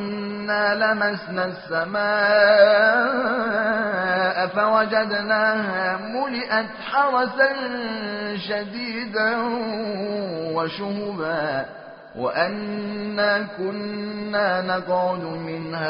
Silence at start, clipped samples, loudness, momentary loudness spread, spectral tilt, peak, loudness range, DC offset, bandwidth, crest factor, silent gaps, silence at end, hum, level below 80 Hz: 0 s; under 0.1%; -22 LUFS; 10 LU; -2.5 dB/octave; -2 dBFS; 7 LU; under 0.1%; 5.6 kHz; 20 dB; none; 0 s; none; -64 dBFS